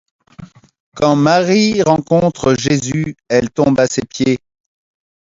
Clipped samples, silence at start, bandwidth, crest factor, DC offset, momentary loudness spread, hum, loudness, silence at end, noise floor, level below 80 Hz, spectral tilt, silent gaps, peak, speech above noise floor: under 0.1%; 0.4 s; 7.8 kHz; 16 dB; under 0.1%; 6 LU; none; -14 LUFS; 0.95 s; -38 dBFS; -46 dBFS; -5.5 dB/octave; 0.80-0.92 s; 0 dBFS; 25 dB